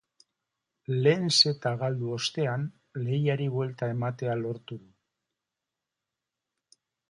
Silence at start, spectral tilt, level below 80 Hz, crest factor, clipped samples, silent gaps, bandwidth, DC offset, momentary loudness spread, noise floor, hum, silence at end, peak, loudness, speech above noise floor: 0.9 s; -5 dB/octave; -72 dBFS; 24 dB; under 0.1%; none; 11.5 kHz; under 0.1%; 15 LU; -88 dBFS; none; 2.3 s; -8 dBFS; -28 LUFS; 60 dB